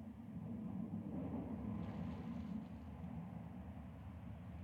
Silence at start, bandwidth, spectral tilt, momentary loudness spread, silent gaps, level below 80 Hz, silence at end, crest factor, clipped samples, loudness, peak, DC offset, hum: 0 s; 14 kHz; -9.5 dB/octave; 7 LU; none; -60 dBFS; 0 s; 14 dB; under 0.1%; -48 LUFS; -34 dBFS; under 0.1%; none